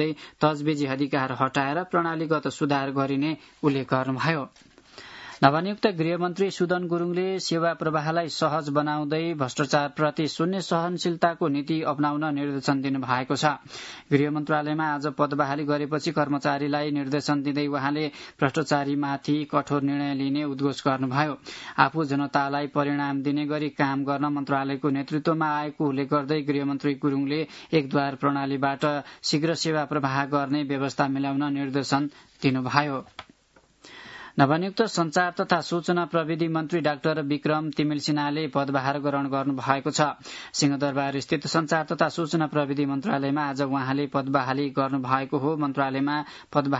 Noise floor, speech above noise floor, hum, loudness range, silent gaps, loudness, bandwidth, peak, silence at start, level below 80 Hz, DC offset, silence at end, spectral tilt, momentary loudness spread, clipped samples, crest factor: -61 dBFS; 35 dB; none; 1 LU; none; -26 LUFS; 8 kHz; 0 dBFS; 0 s; -68 dBFS; under 0.1%; 0 s; -5.5 dB/octave; 4 LU; under 0.1%; 26 dB